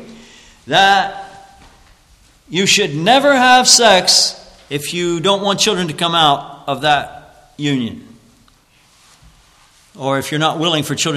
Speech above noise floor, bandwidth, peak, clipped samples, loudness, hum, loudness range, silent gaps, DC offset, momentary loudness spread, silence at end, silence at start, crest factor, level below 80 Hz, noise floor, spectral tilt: 38 dB; 14 kHz; 0 dBFS; under 0.1%; -13 LUFS; none; 11 LU; none; under 0.1%; 15 LU; 0 s; 0 s; 16 dB; -52 dBFS; -52 dBFS; -2.5 dB/octave